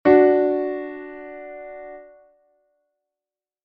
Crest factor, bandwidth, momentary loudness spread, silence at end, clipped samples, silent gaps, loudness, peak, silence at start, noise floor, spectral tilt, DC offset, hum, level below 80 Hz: 20 dB; 4.9 kHz; 24 LU; 1.65 s; under 0.1%; none; -19 LUFS; -4 dBFS; 0.05 s; -90 dBFS; -5 dB/octave; under 0.1%; none; -60 dBFS